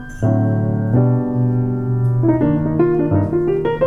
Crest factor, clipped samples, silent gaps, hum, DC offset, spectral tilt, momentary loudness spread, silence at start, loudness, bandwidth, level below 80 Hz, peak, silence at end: 14 dB; under 0.1%; none; none; under 0.1%; -10.5 dB/octave; 3 LU; 0 s; -17 LUFS; 6.4 kHz; -38 dBFS; -2 dBFS; 0 s